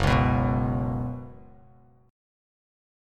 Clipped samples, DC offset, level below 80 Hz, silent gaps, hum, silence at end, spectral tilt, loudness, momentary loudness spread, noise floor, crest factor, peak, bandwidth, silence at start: under 0.1%; under 0.1%; -36 dBFS; none; none; 1.7 s; -7.5 dB/octave; -26 LUFS; 17 LU; -56 dBFS; 18 dB; -10 dBFS; 10 kHz; 0 s